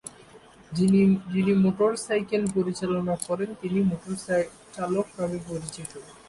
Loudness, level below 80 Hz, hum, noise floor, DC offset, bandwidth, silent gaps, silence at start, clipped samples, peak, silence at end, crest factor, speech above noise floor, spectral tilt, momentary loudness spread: -26 LUFS; -58 dBFS; none; -51 dBFS; under 0.1%; 11.5 kHz; none; 0.05 s; under 0.1%; -12 dBFS; 0.15 s; 14 dB; 26 dB; -6.5 dB/octave; 13 LU